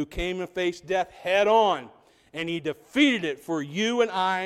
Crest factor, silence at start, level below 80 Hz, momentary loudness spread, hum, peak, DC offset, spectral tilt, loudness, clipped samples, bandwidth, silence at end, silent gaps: 18 dB; 0 s; -50 dBFS; 11 LU; none; -8 dBFS; under 0.1%; -4.5 dB/octave; -25 LUFS; under 0.1%; 14 kHz; 0 s; none